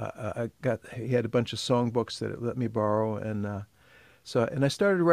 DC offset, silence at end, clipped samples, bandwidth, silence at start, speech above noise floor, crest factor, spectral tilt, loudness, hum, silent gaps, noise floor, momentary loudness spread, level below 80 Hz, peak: under 0.1%; 0 s; under 0.1%; 14.5 kHz; 0 s; 30 dB; 20 dB; -6.5 dB/octave; -29 LUFS; none; none; -58 dBFS; 9 LU; -62 dBFS; -8 dBFS